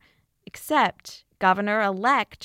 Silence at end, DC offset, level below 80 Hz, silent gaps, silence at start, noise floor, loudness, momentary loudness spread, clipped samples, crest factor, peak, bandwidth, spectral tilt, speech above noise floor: 0 s; under 0.1%; -64 dBFS; none; 0.55 s; -51 dBFS; -23 LUFS; 20 LU; under 0.1%; 18 dB; -6 dBFS; 16.5 kHz; -4.5 dB/octave; 28 dB